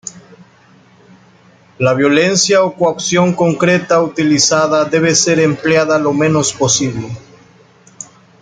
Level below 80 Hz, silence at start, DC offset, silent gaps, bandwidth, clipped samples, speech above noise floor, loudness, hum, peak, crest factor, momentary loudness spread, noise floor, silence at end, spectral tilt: -54 dBFS; 0.05 s; under 0.1%; none; 10 kHz; under 0.1%; 34 dB; -12 LUFS; none; 0 dBFS; 14 dB; 17 LU; -46 dBFS; 0.35 s; -4 dB/octave